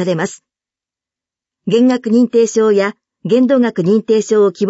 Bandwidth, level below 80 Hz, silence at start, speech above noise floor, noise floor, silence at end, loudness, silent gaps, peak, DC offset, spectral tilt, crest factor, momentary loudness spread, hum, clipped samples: 8 kHz; -66 dBFS; 0 s; 76 dB; -89 dBFS; 0 s; -13 LUFS; none; -2 dBFS; under 0.1%; -6 dB/octave; 12 dB; 9 LU; none; under 0.1%